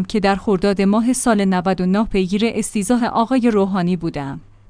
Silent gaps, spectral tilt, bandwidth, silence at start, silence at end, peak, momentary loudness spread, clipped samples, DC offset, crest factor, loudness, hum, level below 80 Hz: none; -5.5 dB/octave; 10.5 kHz; 0 s; 0.3 s; -4 dBFS; 5 LU; under 0.1%; under 0.1%; 14 dB; -17 LUFS; none; -40 dBFS